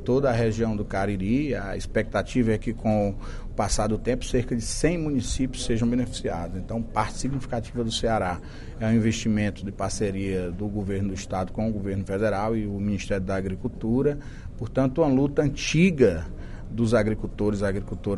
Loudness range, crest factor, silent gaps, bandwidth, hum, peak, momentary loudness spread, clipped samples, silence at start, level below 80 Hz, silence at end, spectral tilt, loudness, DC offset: 4 LU; 18 dB; none; 11.5 kHz; none; -6 dBFS; 8 LU; under 0.1%; 0 s; -36 dBFS; 0 s; -6 dB/octave; -26 LUFS; under 0.1%